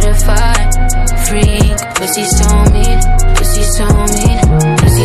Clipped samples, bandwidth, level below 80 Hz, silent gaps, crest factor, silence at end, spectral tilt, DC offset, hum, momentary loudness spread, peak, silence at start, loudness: under 0.1%; 15 kHz; -10 dBFS; none; 8 dB; 0 s; -4.5 dB/octave; 2%; none; 4 LU; 0 dBFS; 0 s; -11 LUFS